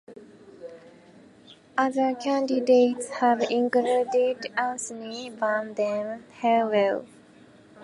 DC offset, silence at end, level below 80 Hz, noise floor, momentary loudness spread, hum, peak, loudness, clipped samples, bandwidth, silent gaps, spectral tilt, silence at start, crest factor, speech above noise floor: under 0.1%; 0 s; -76 dBFS; -53 dBFS; 15 LU; none; -8 dBFS; -25 LUFS; under 0.1%; 11.5 kHz; none; -4 dB/octave; 0.1 s; 18 dB; 28 dB